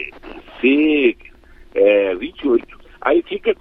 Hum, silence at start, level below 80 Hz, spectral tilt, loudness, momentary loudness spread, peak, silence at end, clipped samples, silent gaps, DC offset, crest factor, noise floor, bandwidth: none; 0 s; -46 dBFS; -7 dB/octave; -17 LUFS; 17 LU; -2 dBFS; 0.05 s; under 0.1%; none; under 0.1%; 16 dB; -43 dBFS; 4.3 kHz